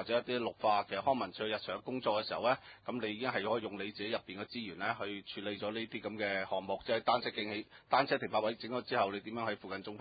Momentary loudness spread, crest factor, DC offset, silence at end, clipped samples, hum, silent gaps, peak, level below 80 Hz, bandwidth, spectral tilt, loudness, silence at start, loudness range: 9 LU; 22 dB; under 0.1%; 0 s; under 0.1%; none; none; -14 dBFS; -72 dBFS; 4.9 kHz; -2 dB/octave; -36 LUFS; 0 s; 4 LU